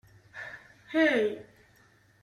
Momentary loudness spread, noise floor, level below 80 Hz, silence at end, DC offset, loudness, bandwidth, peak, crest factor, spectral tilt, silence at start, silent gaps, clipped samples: 22 LU; -62 dBFS; -72 dBFS; 0.8 s; under 0.1%; -27 LUFS; 12 kHz; -12 dBFS; 20 dB; -5 dB/octave; 0.35 s; none; under 0.1%